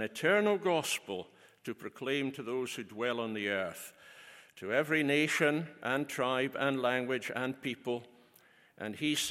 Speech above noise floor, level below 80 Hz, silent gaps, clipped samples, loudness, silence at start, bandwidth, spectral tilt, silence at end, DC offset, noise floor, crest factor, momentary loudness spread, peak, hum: 30 dB; -80 dBFS; none; under 0.1%; -33 LUFS; 0 s; 16.5 kHz; -4 dB/octave; 0 s; under 0.1%; -64 dBFS; 20 dB; 17 LU; -14 dBFS; none